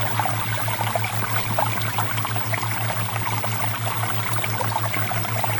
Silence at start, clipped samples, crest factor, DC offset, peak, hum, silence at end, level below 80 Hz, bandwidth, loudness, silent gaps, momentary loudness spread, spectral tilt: 0 s; under 0.1%; 16 dB; under 0.1%; -6 dBFS; none; 0 s; -52 dBFS; 19 kHz; -22 LUFS; none; 2 LU; -4 dB/octave